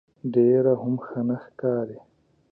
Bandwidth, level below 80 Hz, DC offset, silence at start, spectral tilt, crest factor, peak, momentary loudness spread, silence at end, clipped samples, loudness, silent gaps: 3.4 kHz; -70 dBFS; under 0.1%; 0.25 s; -12.5 dB/octave; 16 dB; -8 dBFS; 10 LU; 0.55 s; under 0.1%; -24 LUFS; none